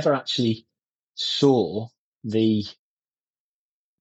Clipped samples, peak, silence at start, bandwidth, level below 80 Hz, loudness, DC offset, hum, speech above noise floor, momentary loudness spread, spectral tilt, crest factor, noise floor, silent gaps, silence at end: under 0.1%; -6 dBFS; 0 s; 8.2 kHz; -68 dBFS; -23 LUFS; under 0.1%; none; over 68 dB; 18 LU; -6 dB/octave; 20 dB; under -90 dBFS; 0.89-1.07 s, 1.98-2.21 s; 1.3 s